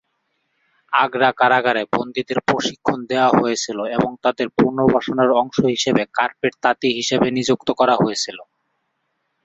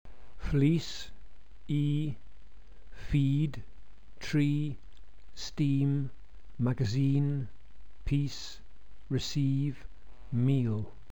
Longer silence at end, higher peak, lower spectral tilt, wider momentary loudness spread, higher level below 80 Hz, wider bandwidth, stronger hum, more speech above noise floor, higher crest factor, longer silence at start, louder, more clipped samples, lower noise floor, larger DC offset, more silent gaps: first, 1 s vs 0.1 s; first, 0 dBFS vs -16 dBFS; second, -4.5 dB/octave vs -7 dB/octave; second, 7 LU vs 17 LU; second, -56 dBFS vs -48 dBFS; second, 8.4 kHz vs 15.5 kHz; neither; first, 53 dB vs 23 dB; about the same, 18 dB vs 16 dB; first, 0.9 s vs 0.05 s; first, -18 LUFS vs -31 LUFS; neither; first, -72 dBFS vs -53 dBFS; second, under 0.1% vs 1%; neither